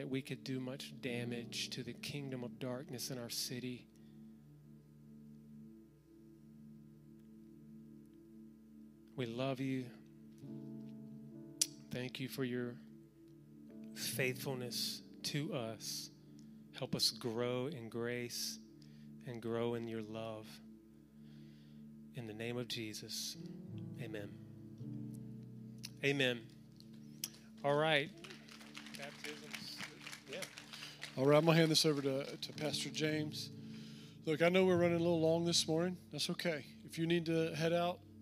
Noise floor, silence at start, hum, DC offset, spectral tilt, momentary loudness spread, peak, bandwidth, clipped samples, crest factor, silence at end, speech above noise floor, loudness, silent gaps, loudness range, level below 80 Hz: -62 dBFS; 0 s; none; under 0.1%; -4.5 dB/octave; 25 LU; -14 dBFS; 15.5 kHz; under 0.1%; 28 dB; 0 s; 24 dB; -39 LUFS; none; 13 LU; -76 dBFS